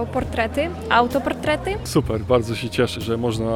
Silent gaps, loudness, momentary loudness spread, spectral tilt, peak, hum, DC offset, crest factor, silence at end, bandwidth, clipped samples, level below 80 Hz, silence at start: none; -21 LUFS; 5 LU; -5.5 dB/octave; -4 dBFS; none; under 0.1%; 18 dB; 0 s; 17 kHz; under 0.1%; -38 dBFS; 0 s